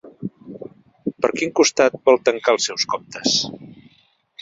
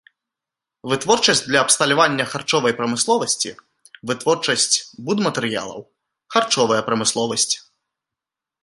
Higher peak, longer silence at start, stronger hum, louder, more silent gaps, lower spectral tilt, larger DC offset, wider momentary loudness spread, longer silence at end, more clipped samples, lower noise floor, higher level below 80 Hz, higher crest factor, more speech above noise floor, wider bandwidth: about the same, 0 dBFS vs 0 dBFS; second, 0.05 s vs 0.85 s; neither; about the same, -19 LUFS vs -18 LUFS; neither; about the same, -2.5 dB/octave vs -2 dB/octave; neither; first, 22 LU vs 10 LU; second, 0.7 s vs 1.05 s; neither; second, -59 dBFS vs -86 dBFS; about the same, -62 dBFS vs -64 dBFS; about the same, 20 dB vs 20 dB; second, 41 dB vs 67 dB; second, 8 kHz vs 11.5 kHz